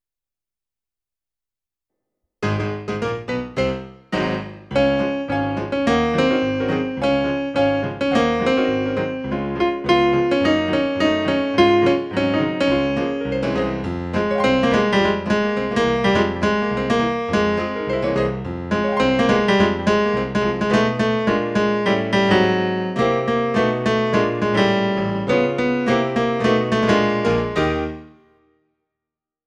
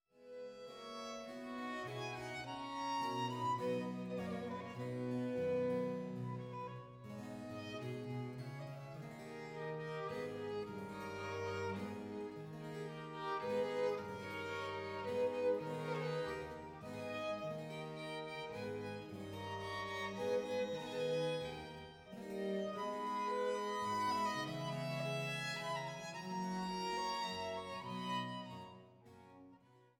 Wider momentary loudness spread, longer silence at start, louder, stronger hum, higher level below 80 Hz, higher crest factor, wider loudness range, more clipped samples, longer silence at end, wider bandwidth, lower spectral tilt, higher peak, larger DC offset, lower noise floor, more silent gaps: second, 7 LU vs 11 LU; first, 2.4 s vs 0.15 s; first, -19 LUFS vs -43 LUFS; neither; first, -42 dBFS vs -74 dBFS; about the same, 18 dB vs 18 dB; about the same, 5 LU vs 5 LU; neither; first, 1.4 s vs 0.15 s; second, 10 kHz vs 17 kHz; about the same, -6 dB/octave vs -5.5 dB/octave; first, -2 dBFS vs -26 dBFS; neither; first, under -90 dBFS vs -66 dBFS; neither